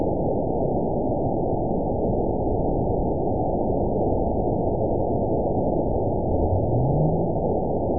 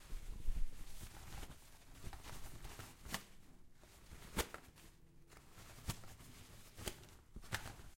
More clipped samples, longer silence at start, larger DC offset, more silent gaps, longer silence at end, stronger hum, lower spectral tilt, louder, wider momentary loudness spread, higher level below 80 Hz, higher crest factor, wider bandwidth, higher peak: neither; about the same, 0 s vs 0 s; first, 2% vs under 0.1%; neither; about the same, 0 s vs 0.05 s; neither; first, -19 dB/octave vs -3.5 dB/octave; first, -24 LUFS vs -51 LUFS; second, 2 LU vs 17 LU; first, -34 dBFS vs -52 dBFS; second, 12 dB vs 24 dB; second, 1 kHz vs 16.5 kHz; first, -10 dBFS vs -22 dBFS